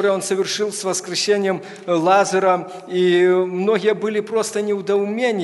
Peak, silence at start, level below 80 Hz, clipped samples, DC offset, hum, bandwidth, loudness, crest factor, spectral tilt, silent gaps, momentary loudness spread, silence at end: -2 dBFS; 0 s; -72 dBFS; under 0.1%; under 0.1%; none; 12 kHz; -19 LUFS; 16 dB; -4 dB/octave; none; 7 LU; 0 s